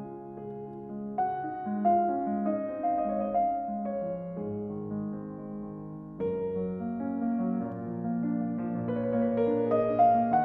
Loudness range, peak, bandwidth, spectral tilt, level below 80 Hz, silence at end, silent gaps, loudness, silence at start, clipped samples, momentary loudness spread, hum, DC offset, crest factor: 6 LU; -12 dBFS; 4 kHz; -11.5 dB/octave; -62 dBFS; 0 s; none; -30 LUFS; 0 s; under 0.1%; 14 LU; none; under 0.1%; 18 dB